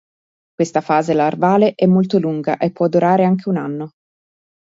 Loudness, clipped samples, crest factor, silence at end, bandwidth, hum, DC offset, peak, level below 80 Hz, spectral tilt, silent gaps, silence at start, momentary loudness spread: -16 LUFS; under 0.1%; 16 dB; 0.8 s; 7.8 kHz; none; under 0.1%; -2 dBFS; -62 dBFS; -7.5 dB/octave; none; 0.6 s; 8 LU